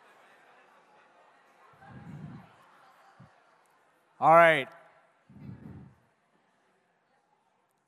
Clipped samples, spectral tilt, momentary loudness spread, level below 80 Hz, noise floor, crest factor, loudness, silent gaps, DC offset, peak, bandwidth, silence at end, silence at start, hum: under 0.1%; -5.5 dB/octave; 30 LU; -76 dBFS; -73 dBFS; 26 dB; -22 LUFS; none; under 0.1%; -6 dBFS; 14 kHz; 2.35 s; 2.2 s; none